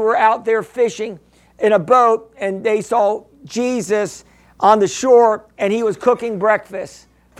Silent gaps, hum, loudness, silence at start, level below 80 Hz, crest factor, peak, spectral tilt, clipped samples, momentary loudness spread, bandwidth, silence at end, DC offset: none; none; -16 LUFS; 0 s; -58 dBFS; 16 dB; 0 dBFS; -4.5 dB/octave; under 0.1%; 14 LU; 12.5 kHz; 0.5 s; under 0.1%